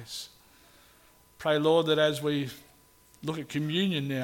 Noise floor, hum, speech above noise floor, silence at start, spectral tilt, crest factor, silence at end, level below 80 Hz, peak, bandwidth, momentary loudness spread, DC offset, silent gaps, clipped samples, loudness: -60 dBFS; 60 Hz at -70 dBFS; 32 dB; 0 s; -5.5 dB/octave; 18 dB; 0 s; -68 dBFS; -12 dBFS; 17.5 kHz; 16 LU; under 0.1%; none; under 0.1%; -28 LUFS